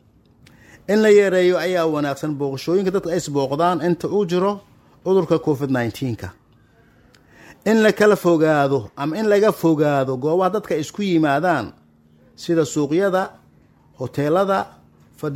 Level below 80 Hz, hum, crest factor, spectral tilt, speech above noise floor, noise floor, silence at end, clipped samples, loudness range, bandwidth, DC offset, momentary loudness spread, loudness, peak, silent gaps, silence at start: -58 dBFS; none; 16 dB; -6 dB/octave; 36 dB; -54 dBFS; 0 s; under 0.1%; 5 LU; 16.5 kHz; under 0.1%; 12 LU; -19 LUFS; -2 dBFS; none; 0.9 s